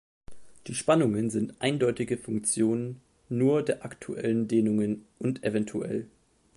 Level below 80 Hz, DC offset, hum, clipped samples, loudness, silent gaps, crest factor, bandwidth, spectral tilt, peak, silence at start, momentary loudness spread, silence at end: -62 dBFS; under 0.1%; none; under 0.1%; -28 LUFS; none; 18 dB; 11.5 kHz; -5.5 dB/octave; -10 dBFS; 0.3 s; 11 LU; 0.5 s